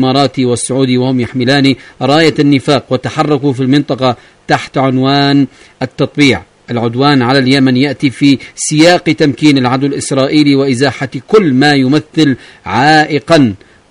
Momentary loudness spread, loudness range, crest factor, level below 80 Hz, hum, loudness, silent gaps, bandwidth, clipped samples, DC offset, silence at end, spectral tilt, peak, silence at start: 8 LU; 2 LU; 10 dB; -46 dBFS; none; -10 LUFS; none; 11 kHz; 0.5%; under 0.1%; 0.35 s; -5.5 dB/octave; 0 dBFS; 0 s